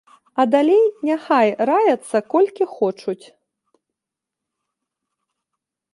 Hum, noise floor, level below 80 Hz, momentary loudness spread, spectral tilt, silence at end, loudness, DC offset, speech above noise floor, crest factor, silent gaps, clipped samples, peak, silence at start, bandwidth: none; -85 dBFS; -76 dBFS; 13 LU; -5.5 dB/octave; 2.8 s; -18 LUFS; under 0.1%; 68 dB; 18 dB; none; under 0.1%; -2 dBFS; 0.35 s; 11.5 kHz